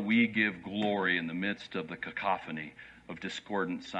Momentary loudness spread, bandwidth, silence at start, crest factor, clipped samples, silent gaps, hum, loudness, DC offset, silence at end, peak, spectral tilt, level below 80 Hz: 14 LU; 8.2 kHz; 0 s; 18 dB; under 0.1%; none; none; -32 LUFS; under 0.1%; 0 s; -14 dBFS; -5.5 dB/octave; -70 dBFS